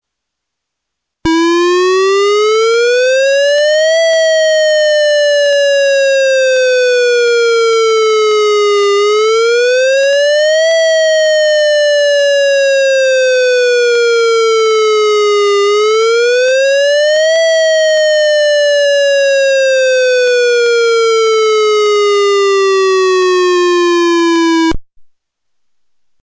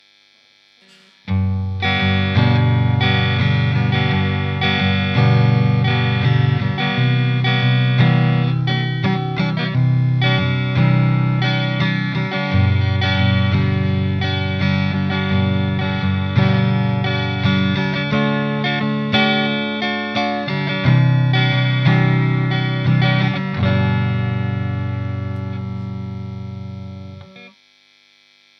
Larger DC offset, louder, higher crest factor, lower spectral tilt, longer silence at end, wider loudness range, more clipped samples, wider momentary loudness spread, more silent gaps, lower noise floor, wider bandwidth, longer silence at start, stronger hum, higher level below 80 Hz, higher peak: neither; first, -9 LUFS vs -17 LUFS; second, 2 dB vs 16 dB; second, -1.5 dB/octave vs -8 dB/octave; about the same, 1.2 s vs 1.1 s; second, 1 LU vs 4 LU; neither; second, 1 LU vs 8 LU; neither; first, -76 dBFS vs -53 dBFS; first, 8 kHz vs 6.2 kHz; about the same, 1.25 s vs 1.25 s; neither; about the same, -46 dBFS vs -48 dBFS; second, -8 dBFS vs -2 dBFS